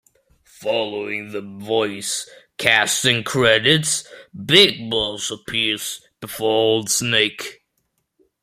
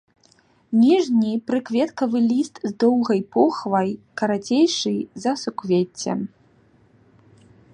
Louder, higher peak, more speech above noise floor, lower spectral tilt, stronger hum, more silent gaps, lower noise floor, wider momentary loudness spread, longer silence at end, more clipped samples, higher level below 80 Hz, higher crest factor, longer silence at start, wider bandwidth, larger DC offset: first, -18 LUFS vs -21 LUFS; first, 0 dBFS vs -4 dBFS; first, 52 dB vs 38 dB; second, -2.5 dB/octave vs -5.5 dB/octave; neither; neither; first, -71 dBFS vs -58 dBFS; first, 17 LU vs 9 LU; second, 0.9 s vs 1.45 s; neither; first, -56 dBFS vs -68 dBFS; about the same, 20 dB vs 18 dB; about the same, 0.6 s vs 0.7 s; first, 16 kHz vs 10 kHz; neither